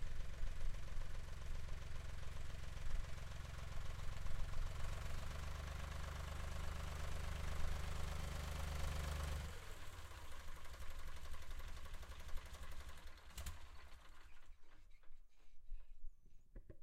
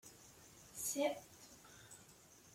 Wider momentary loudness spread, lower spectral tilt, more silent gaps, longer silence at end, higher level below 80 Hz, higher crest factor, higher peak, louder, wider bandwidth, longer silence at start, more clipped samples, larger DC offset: second, 15 LU vs 21 LU; first, -4.5 dB/octave vs -2 dB/octave; neither; about the same, 0 s vs 0 s; first, -48 dBFS vs -78 dBFS; second, 16 dB vs 22 dB; about the same, -28 dBFS vs -26 dBFS; second, -51 LUFS vs -42 LUFS; about the same, 15 kHz vs 16.5 kHz; about the same, 0 s vs 0.05 s; neither; neither